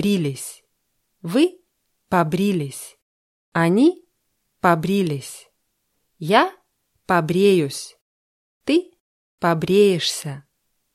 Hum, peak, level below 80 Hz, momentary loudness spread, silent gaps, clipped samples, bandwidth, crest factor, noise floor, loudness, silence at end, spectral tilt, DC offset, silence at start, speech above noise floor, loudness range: none; -2 dBFS; -60 dBFS; 19 LU; 3.02-3.52 s, 8.01-8.61 s, 9.00-9.38 s; under 0.1%; 14.5 kHz; 20 dB; -72 dBFS; -20 LUFS; 0.55 s; -5.5 dB/octave; under 0.1%; 0 s; 53 dB; 3 LU